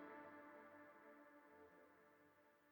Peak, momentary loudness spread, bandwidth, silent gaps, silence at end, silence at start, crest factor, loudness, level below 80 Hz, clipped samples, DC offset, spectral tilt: -48 dBFS; 8 LU; over 20 kHz; none; 0 s; 0 s; 16 dB; -64 LUFS; under -90 dBFS; under 0.1%; under 0.1%; -5.5 dB/octave